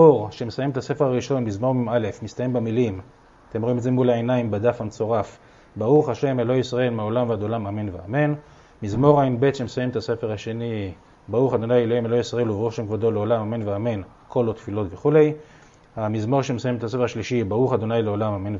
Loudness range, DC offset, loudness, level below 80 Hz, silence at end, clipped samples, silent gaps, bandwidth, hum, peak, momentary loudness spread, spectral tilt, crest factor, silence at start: 2 LU; under 0.1%; -23 LUFS; -54 dBFS; 0 s; under 0.1%; none; 7.8 kHz; none; -2 dBFS; 10 LU; -7.5 dB/octave; 20 dB; 0 s